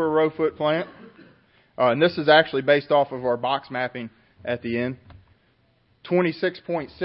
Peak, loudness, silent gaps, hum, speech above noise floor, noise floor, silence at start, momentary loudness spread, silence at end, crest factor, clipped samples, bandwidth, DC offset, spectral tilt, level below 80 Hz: -2 dBFS; -22 LUFS; none; none; 41 dB; -63 dBFS; 0 s; 13 LU; 0 s; 20 dB; under 0.1%; 5.8 kHz; under 0.1%; -10 dB/octave; -62 dBFS